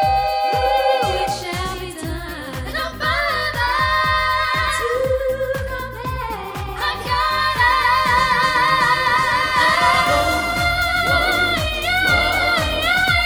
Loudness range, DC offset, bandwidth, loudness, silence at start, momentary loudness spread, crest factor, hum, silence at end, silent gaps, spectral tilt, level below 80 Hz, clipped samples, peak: 6 LU; under 0.1%; over 20 kHz; -18 LUFS; 0 s; 11 LU; 16 dB; none; 0 s; none; -3.5 dB/octave; -34 dBFS; under 0.1%; -2 dBFS